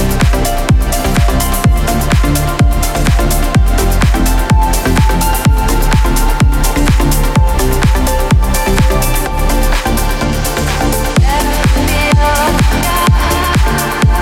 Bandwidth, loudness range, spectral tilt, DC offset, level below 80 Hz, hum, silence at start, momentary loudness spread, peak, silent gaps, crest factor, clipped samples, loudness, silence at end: 17 kHz; 2 LU; -5 dB/octave; under 0.1%; -12 dBFS; none; 0 s; 3 LU; 0 dBFS; none; 10 dB; under 0.1%; -12 LUFS; 0 s